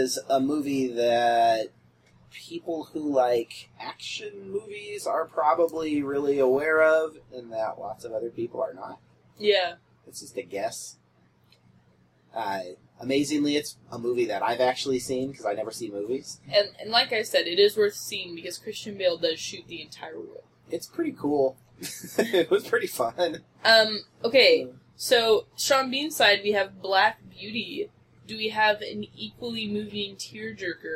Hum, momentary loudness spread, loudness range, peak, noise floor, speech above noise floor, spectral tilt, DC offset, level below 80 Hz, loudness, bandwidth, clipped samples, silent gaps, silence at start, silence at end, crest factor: none; 17 LU; 9 LU; -4 dBFS; -62 dBFS; 36 dB; -3 dB/octave; under 0.1%; -70 dBFS; -25 LUFS; 16 kHz; under 0.1%; none; 0 s; 0 s; 22 dB